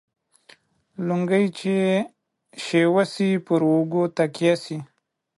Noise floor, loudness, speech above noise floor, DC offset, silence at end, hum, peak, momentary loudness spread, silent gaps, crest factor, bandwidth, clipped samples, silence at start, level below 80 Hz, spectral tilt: -55 dBFS; -22 LUFS; 34 dB; under 0.1%; 0.55 s; none; -8 dBFS; 14 LU; none; 16 dB; 11.5 kHz; under 0.1%; 1 s; -70 dBFS; -6.5 dB/octave